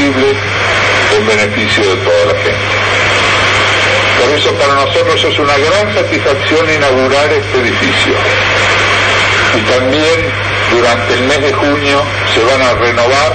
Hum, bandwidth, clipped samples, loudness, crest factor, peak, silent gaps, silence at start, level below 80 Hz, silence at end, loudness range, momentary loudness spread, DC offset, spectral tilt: none; 9.2 kHz; under 0.1%; -9 LUFS; 10 dB; 0 dBFS; none; 0 s; -34 dBFS; 0 s; 1 LU; 3 LU; under 0.1%; -4 dB/octave